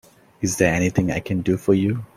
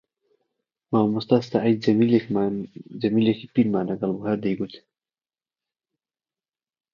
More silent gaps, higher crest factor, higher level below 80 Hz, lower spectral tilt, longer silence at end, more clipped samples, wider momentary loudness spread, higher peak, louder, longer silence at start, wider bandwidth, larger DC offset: neither; about the same, 18 dB vs 20 dB; first, -46 dBFS vs -64 dBFS; second, -6 dB/octave vs -8.5 dB/octave; second, 0.1 s vs 2.15 s; neither; about the same, 6 LU vs 8 LU; about the same, -2 dBFS vs -4 dBFS; about the same, -21 LUFS vs -23 LUFS; second, 0.4 s vs 0.9 s; first, 16 kHz vs 7 kHz; neither